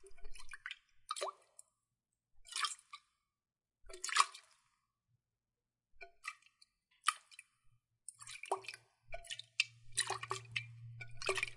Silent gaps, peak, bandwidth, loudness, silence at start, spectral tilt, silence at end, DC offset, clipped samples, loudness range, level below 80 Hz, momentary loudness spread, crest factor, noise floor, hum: none; -14 dBFS; 11.5 kHz; -41 LUFS; 0 s; -0.5 dB/octave; 0 s; under 0.1%; under 0.1%; 6 LU; -64 dBFS; 22 LU; 32 dB; under -90 dBFS; none